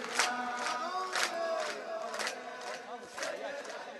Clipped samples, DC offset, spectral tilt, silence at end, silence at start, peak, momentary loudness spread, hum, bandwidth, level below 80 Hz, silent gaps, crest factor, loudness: under 0.1%; under 0.1%; 0 dB/octave; 0 s; 0 s; -12 dBFS; 10 LU; none; 12 kHz; -86 dBFS; none; 26 dB; -36 LUFS